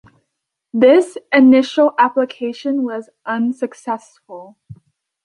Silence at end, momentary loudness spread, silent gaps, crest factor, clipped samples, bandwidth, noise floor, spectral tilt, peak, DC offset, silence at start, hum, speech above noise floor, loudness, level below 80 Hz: 0.5 s; 16 LU; none; 14 dB; under 0.1%; 11 kHz; -77 dBFS; -5.5 dB/octave; -2 dBFS; under 0.1%; 0.75 s; none; 61 dB; -16 LUFS; -64 dBFS